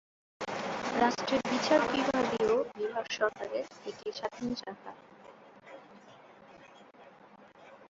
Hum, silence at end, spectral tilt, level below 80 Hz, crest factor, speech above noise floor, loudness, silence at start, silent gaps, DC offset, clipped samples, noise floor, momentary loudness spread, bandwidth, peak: none; 0.05 s; -4 dB/octave; -68 dBFS; 22 dB; 25 dB; -32 LUFS; 0.4 s; none; under 0.1%; under 0.1%; -56 dBFS; 22 LU; 8 kHz; -12 dBFS